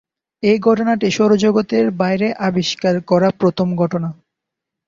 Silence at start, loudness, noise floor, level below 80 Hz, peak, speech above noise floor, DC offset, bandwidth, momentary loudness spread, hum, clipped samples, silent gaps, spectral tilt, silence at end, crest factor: 0.45 s; -16 LUFS; -81 dBFS; -56 dBFS; -2 dBFS; 66 dB; under 0.1%; 7.6 kHz; 5 LU; none; under 0.1%; none; -6 dB/octave; 0.75 s; 14 dB